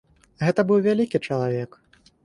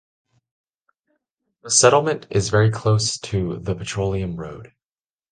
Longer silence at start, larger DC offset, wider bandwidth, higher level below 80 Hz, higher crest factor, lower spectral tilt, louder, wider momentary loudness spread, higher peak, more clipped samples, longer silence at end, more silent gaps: second, 0.4 s vs 1.65 s; neither; first, 11 kHz vs 9.8 kHz; second, -60 dBFS vs -44 dBFS; second, 16 dB vs 22 dB; first, -8 dB/octave vs -4 dB/octave; second, -23 LUFS vs -20 LUFS; second, 9 LU vs 15 LU; second, -8 dBFS vs 0 dBFS; neither; about the same, 0.6 s vs 0.65 s; neither